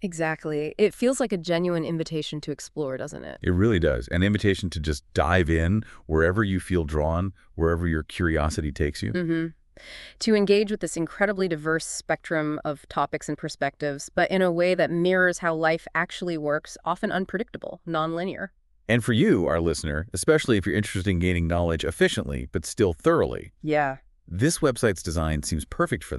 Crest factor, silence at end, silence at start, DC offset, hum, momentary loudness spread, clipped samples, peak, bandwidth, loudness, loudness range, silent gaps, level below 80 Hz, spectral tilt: 20 dB; 0 s; 0 s; under 0.1%; none; 10 LU; under 0.1%; -4 dBFS; 12.5 kHz; -25 LUFS; 3 LU; none; -40 dBFS; -5.5 dB/octave